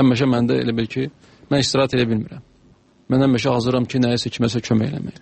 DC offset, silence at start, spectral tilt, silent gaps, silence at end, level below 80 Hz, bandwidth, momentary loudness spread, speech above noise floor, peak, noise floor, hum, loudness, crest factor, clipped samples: under 0.1%; 0 s; -6 dB/octave; none; 0.1 s; -48 dBFS; 8.8 kHz; 8 LU; 35 dB; -4 dBFS; -53 dBFS; none; -20 LUFS; 16 dB; under 0.1%